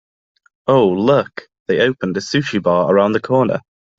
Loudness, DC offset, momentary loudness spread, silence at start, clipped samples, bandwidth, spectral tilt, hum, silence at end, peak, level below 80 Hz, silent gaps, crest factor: -16 LUFS; under 0.1%; 11 LU; 0.65 s; under 0.1%; 7.8 kHz; -6.5 dB/octave; none; 0.4 s; -2 dBFS; -56 dBFS; 1.60-1.66 s; 14 dB